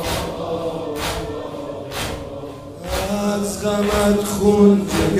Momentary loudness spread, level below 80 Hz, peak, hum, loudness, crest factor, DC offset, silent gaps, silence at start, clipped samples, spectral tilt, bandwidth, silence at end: 16 LU; -36 dBFS; -2 dBFS; none; -20 LUFS; 18 dB; under 0.1%; none; 0 s; under 0.1%; -5.5 dB/octave; 16 kHz; 0 s